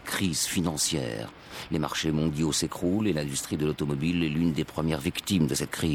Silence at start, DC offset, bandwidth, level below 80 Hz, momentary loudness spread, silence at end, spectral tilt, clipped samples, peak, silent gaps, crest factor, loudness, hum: 0 s; under 0.1%; 18 kHz; -50 dBFS; 5 LU; 0 s; -4.5 dB/octave; under 0.1%; -12 dBFS; none; 16 dB; -28 LUFS; none